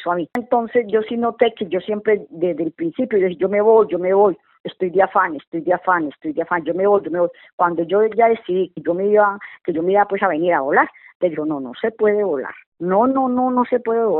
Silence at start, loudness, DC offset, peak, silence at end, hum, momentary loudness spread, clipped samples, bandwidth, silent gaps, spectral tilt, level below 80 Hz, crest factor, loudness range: 0 s; -19 LUFS; under 0.1%; 0 dBFS; 0 s; none; 9 LU; under 0.1%; 4.1 kHz; 4.60-4.64 s, 5.47-5.52 s, 7.53-7.58 s, 11.15-11.20 s, 12.66-12.72 s; -4.5 dB/octave; -64 dBFS; 18 dB; 2 LU